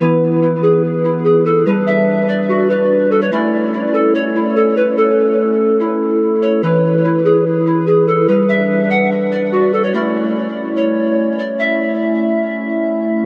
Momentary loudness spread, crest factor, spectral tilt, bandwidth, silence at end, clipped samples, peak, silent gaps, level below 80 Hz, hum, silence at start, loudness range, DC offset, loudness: 4 LU; 12 dB; -9.5 dB/octave; 5.6 kHz; 0 s; under 0.1%; -2 dBFS; none; -72 dBFS; none; 0 s; 3 LU; under 0.1%; -15 LUFS